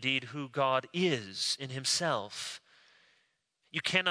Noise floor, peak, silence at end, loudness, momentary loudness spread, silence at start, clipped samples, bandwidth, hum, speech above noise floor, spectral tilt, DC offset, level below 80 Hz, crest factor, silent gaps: -76 dBFS; -12 dBFS; 0 s; -32 LUFS; 10 LU; 0 s; under 0.1%; 11 kHz; none; 44 dB; -3 dB/octave; under 0.1%; -80 dBFS; 22 dB; none